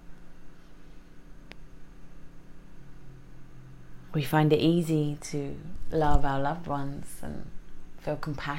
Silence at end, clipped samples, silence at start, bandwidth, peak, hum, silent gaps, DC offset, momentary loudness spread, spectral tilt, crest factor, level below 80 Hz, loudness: 0 s; under 0.1%; 0 s; 16 kHz; -6 dBFS; none; none; under 0.1%; 27 LU; -6.5 dB/octave; 22 dB; -40 dBFS; -29 LUFS